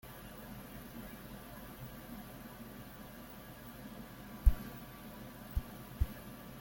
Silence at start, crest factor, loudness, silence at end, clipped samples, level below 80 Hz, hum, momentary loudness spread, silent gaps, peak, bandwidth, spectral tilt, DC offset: 0.05 s; 28 dB; -45 LUFS; 0 s; under 0.1%; -42 dBFS; none; 14 LU; none; -12 dBFS; 17 kHz; -6 dB/octave; under 0.1%